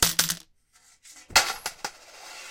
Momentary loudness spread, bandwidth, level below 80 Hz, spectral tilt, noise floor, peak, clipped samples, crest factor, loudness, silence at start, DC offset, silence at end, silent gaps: 20 LU; 17 kHz; -52 dBFS; 0 dB/octave; -61 dBFS; -2 dBFS; under 0.1%; 26 dB; -24 LUFS; 0 s; under 0.1%; 0 s; none